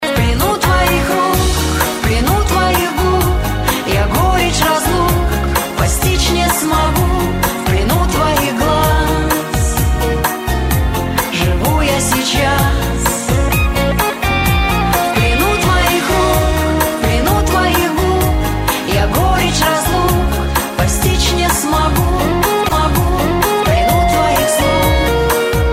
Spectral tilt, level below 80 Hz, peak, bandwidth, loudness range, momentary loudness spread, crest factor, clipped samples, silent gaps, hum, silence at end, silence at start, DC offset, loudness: -4.5 dB/octave; -20 dBFS; 0 dBFS; 16.5 kHz; 1 LU; 3 LU; 14 dB; under 0.1%; none; none; 0 s; 0 s; under 0.1%; -14 LUFS